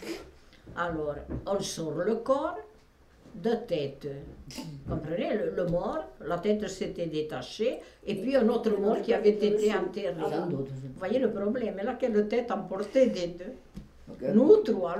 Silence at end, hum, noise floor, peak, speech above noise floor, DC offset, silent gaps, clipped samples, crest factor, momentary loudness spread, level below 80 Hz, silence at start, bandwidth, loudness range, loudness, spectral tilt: 0 s; none; -58 dBFS; -8 dBFS; 29 dB; under 0.1%; none; under 0.1%; 20 dB; 16 LU; -54 dBFS; 0 s; 13.5 kHz; 5 LU; -29 LUFS; -6 dB/octave